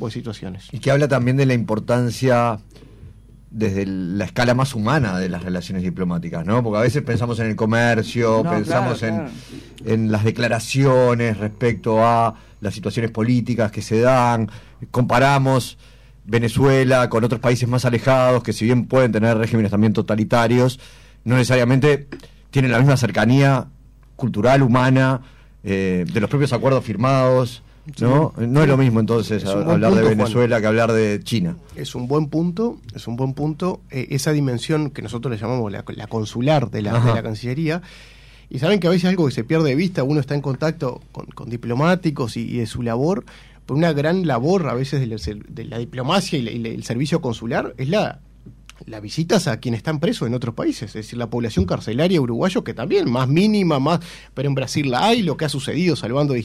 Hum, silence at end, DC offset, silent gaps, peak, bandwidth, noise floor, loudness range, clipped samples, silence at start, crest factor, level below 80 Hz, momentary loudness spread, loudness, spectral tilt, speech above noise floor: none; 0 s; under 0.1%; none; -6 dBFS; 14 kHz; -43 dBFS; 6 LU; under 0.1%; 0 s; 12 dB; -46 dBFS; 12 LU; -19 LUFS; -6.5 dB/octave; 25 dB